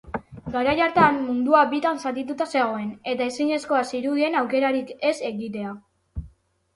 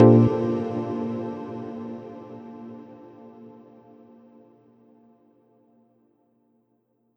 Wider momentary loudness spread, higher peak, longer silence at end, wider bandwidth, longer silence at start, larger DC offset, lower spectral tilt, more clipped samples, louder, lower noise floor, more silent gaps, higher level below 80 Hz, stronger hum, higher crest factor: second, 16 LU vs 26 LU; about the same, -4 dBFS vs -2 dBFS; second, 0.5 s vs 3.7 s; first, 11.5 kHz vs 6 kHz; about the same, 0.05 s vs 0 s; neither; second, -5.5 dB/octave vs -11 dB/octave; neither; about the same, -23 LUFS vs -25 LUFS; second, -54 dBFS vs -69 dBFS; neither; first, -50 dBFS vs -62 dBFS; neither; about the same, 20 dB vs 24 dB